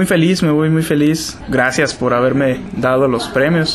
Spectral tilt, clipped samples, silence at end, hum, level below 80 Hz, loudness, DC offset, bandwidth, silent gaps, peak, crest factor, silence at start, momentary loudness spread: -5.5 dB/octave; under 0.1%; 0 s; none; -42 dBFS; -15 LUFS; under 0.1%; 13.5 kHz; none; 0 dBFS; 14 dB; 0 s; 4 LU